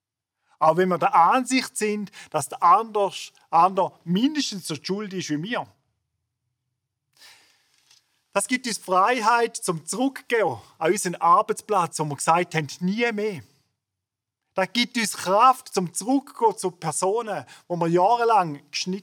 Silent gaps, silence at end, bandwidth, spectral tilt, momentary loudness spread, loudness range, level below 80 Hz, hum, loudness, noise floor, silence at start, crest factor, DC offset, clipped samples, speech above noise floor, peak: none; 0 s; 19.5 kHz; -4 dB/octave; 11 LU; 10 LU; -80 dBFS; none; -23 LUFS; -85 dBFS; 0.6 s; 20 dB; under 0.1%; under 0.1%; 62 dB; -4 dBFS